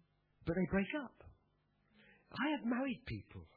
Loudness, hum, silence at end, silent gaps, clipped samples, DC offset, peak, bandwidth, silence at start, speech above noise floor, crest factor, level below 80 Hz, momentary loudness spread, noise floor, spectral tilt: -40 LUFS; none; 0.1 s; none; under 0.1%; under 0.1%; -24 dBFS; 4.6 kHz; 0.4 s; 38 dB; 18 dB; -62 dBFS; 12 LU; -77 dBFS; -5 dB/octave